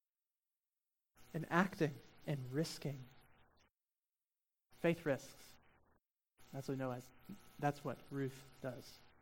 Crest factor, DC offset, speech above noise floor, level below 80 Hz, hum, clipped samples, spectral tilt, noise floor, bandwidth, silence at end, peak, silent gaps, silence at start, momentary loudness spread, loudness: 26 dB; under 0.1%; over 48 dB; -74 dBFS; none; under 0.1%; -6 dB/octave; under -90 dBFS; 17 kHz; 0.15 s; -18 dBFS; 6.11-6.15 s; 1.2 s; 20 LU; -42 LUFS